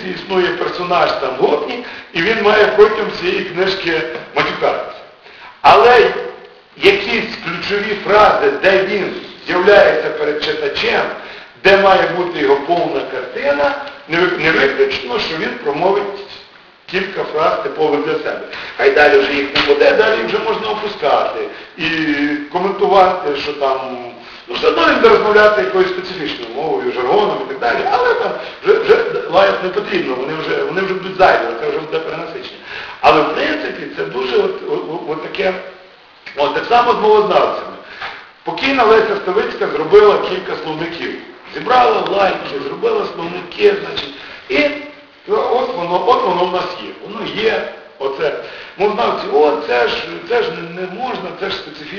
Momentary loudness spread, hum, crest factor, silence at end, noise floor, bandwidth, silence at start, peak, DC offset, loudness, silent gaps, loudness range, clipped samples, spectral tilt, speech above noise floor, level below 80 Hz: 15 LU; none; 14 dB; 0 s; -42 dBFS; 6.8 kHz; 0 s; 0 dBFS; under 0.1%; -15 LUFS; none; 5 LU; under 0.1%; -5 dB/octave; 28 dB; -48 dBFS